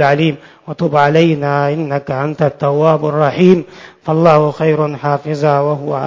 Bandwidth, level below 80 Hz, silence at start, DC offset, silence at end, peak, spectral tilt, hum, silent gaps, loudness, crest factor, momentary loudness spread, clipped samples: 7.4 kHz; -52 dBFS; 0 s; under 0.1%; 0 s; 0 dBFS; -8 dB/octave; none; none; -13 LUFS; 14 dB; 8 LU; 0.1%